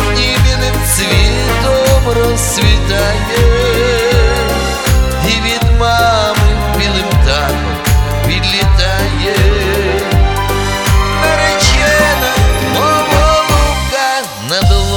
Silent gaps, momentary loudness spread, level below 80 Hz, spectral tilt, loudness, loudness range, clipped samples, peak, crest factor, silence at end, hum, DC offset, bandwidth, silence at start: none; 4 LU; -16 dBFS; -4 dB/octave; -11 LUFS; 2 LU; 0.1%; 0 dBFS; 10 dB; 0 s; none; under 0.1%; over 20 kHz; 0 s